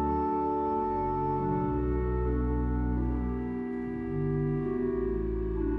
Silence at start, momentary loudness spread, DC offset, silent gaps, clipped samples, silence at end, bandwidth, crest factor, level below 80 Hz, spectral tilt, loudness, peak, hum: 0 s; 4 LU; under 0.1%; none; under 0.1%; 0 s; 3.7 kHz; 12 dB; -36 dBFS; -11.5 dB/octave; -31 LUFS; -18 dBFS; none